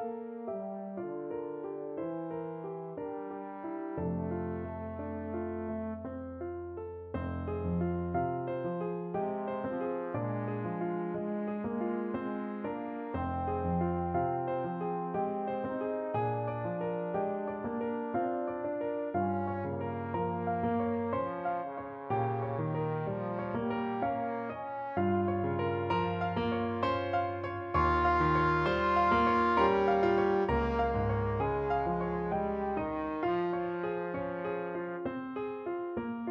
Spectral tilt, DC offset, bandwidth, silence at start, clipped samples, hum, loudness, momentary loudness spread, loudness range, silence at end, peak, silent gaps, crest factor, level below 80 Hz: -9 dB/octave; under 0.1%; 7 kHz; 0 s; under 0.1%; none; -33 LUFS; 12 LU; 10 LU; 0 s; -16 dBFS; none; 18 dB; -52 dBFS